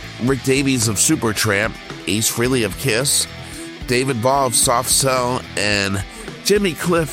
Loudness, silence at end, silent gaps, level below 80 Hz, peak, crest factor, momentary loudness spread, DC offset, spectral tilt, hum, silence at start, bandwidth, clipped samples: -17 LUFS; 0 s; none; -40 dBFS; -2 dBFS; 16 dB; 9 LU; under 0.1%; -3 dB/octave; none; 0 s; 19 kHz; under 0.1%